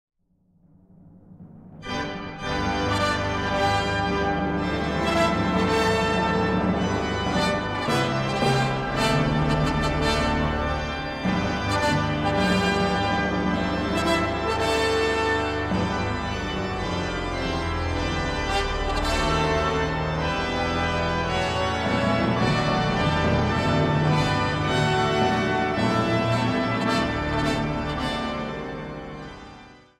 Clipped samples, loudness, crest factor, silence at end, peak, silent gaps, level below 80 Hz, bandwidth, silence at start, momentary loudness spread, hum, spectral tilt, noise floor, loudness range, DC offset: under 0.1%; -24 LUFS; 16 dB; 0.25 s; -8 dBFS; none; -36 dBFS; 15 kHz; 1.05 s; 6 LU; none; -5.5 dB/octave; -64 dBFS; 4 LU; under 0.1%